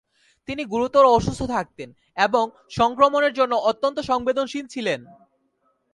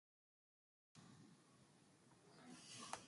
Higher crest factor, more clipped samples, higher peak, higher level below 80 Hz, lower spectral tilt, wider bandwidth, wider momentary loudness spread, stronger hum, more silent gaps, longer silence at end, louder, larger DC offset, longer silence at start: second, 20 dB vs 32 dB; neither; first, -2 dBFS vs -30 dBFS; first, -48 dBFS vs under -90 dBFS; first, -5 dB/octave vs -2.5 dB/octave; about the same, 11.5 kHz vs 11.5 kHz; about the same, 15 LU vs 13 LU; neither; neither; first, 0.9 s vs 0 s; first, -21 LUFS vs -61 LUFS; neither; second, 0.5 s vs 0.95 s